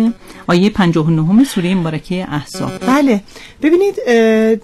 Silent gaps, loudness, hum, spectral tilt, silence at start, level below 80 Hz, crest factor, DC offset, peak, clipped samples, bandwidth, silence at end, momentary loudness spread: none; -14 LUFS; none; -6.5 dB/octave; 0 s; -42 dBFS; 10 dB; under 0.1%; -4 dBFS; under 0.1%; 13.5 kHz; 0.05 s; 9 LU